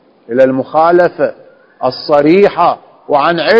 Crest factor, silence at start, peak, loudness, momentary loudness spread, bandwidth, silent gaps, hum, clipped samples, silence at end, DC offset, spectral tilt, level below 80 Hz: 10 dB; 0.3 s; 0 dBFS; -11 LUFS; 10 LU; 8 kHz; none; none; 0.7%; 0 s; under 0.1%; -7.5 dB/octave; -52 dBFS